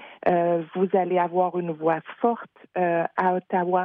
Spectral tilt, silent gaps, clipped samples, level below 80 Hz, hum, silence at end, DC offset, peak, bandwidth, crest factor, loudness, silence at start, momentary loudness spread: -10 dB/octave; none; under 0.1%; -70 dBFS; none; 0 s; under 0.1%; -8 dBFS; 4.4 kHz; 16 dB; -24 LUFS; 0 s; 4 LU